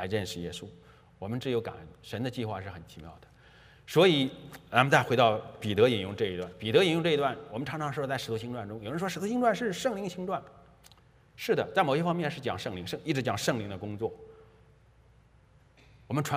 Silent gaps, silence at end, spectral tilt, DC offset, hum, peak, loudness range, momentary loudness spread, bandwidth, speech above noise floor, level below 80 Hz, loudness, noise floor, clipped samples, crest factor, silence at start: none; 0 s; -5.5 dB/octave; under 0.1%; none; -4 dBFS; 9 LU; 16 LU; 15.5 kHz; 31 dB; -64 dBFS; -30 LUFS; -61 dBFS; under 0.1%; 26 dB; 0 s